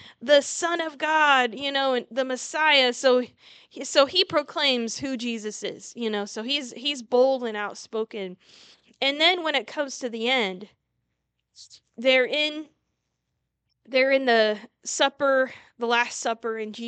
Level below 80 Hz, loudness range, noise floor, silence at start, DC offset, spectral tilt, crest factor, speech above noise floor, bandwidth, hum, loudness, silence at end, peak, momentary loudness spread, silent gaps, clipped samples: -76 dBFS; 5 LU; -79 dBFS; 0 s; under 0.1%; -1.5 dB/octave; 20 dB; 55 dB; 9.2 kHz; none; -23 LUFS; 0 s; -4 dBFS; 12 LU; none; under 0.1%